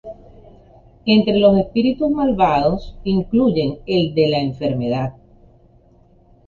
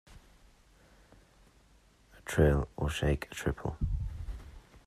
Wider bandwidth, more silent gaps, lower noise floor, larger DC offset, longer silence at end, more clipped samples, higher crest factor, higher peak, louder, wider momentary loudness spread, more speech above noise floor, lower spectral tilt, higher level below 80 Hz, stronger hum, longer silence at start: second, 7 kHz vs 13.5 kHz; neither; second, -51 dBFS vs -63 dBFS; neither; first, 1.35 s vs 0.1 s; neither; second, 16 dB vs 22 dB; first, -2 dBFS vs -14 dBFS; first, -18 LUFS vs -33 LUFS; second, 9 LU vs 19 LU; about the same, 35 dB vs 33 dB; first, -8.5 dB/octave vs -6.5 dB/octave; about the same, -42 dBFS vs -42 dBFS; neither; about the same, 0.05 s vs 0.1 s